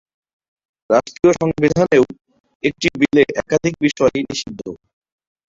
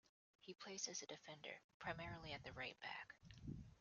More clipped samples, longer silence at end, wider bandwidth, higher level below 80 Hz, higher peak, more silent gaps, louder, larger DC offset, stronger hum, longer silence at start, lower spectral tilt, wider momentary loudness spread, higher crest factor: neither; first, 0.75 s vs 0 s; about the same, 7.8 kHz vs 7.2 kHz; first, -48 dBFS vs -72 dBFS; first, -2 dBFS vs -30 dBFS; second, 2.40-2.44 s, 2.55-2.60 s vs 1.64-1.80 s; first, -17 LUFS vs -53 LUFS; neither; neither; first, 0.9 s vs 0.4 s; first, -5.5 dB/octave vs -2.5 dB/octave; about the same, 10 LU vs 10 LU; second, 16 dB vs 24 dB